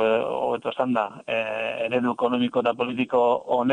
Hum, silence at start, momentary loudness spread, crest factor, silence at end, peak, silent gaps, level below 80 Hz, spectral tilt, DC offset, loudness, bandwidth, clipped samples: none; 0 s; 5 LU; 16 dB; 0 s; -8 dBFS; none; -66 dBFS; -6.5 dB/octave; under 0.1%; -24 LUFS; 9.8 kHz; under 0.1%